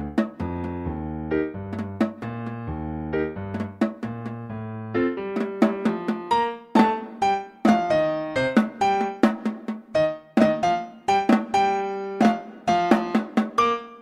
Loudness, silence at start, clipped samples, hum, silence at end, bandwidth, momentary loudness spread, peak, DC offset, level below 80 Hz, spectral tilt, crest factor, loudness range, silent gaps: -24 LUFS; 0 s; under 0.1%; none; 0 s; 11 kHz; 11 LU; -2 dBFS; under 0.1%; -48 dBFS; -6.5 dB/octave; 20 dB; 7 LU; none